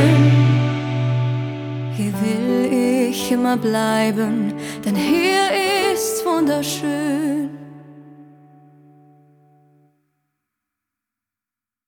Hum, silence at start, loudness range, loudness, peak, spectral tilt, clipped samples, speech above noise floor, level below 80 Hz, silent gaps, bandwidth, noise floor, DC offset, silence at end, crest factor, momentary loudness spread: none; 0 s; 8 LU; -19 LUFS; -2 dBFS; -6 dB/octave; under 0.1%; 70 dB; -56 dBFS; none; 19 kHz; -89 dBFS; under 0.1%; 3.65 s; 18 dB; 9 LU